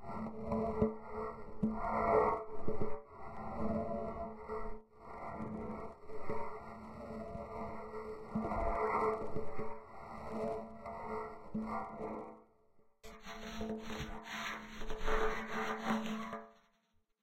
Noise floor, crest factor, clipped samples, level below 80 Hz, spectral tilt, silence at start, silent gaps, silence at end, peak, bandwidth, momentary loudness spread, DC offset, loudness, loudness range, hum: -76 dBFS; 20 dB; under 0.1%; -50 dBFS; -6 dB/octave; 0 s; none; 0.7 s; -18 dBFS; 14 kHz; 14 LU; under 0.1%; -41 LUFS; 8 LU; none